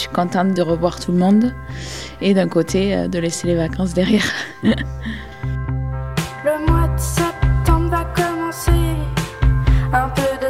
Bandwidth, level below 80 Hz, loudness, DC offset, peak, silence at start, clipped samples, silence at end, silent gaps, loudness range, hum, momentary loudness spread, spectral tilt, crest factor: 16 kHz; -24 dBFS; -19 LUFS; 0.6%; -2 dBFS; 0 s; under 0.1%; 0 s; none; 2 LU; none; 8 LU; -6 dB/octave; 14 dB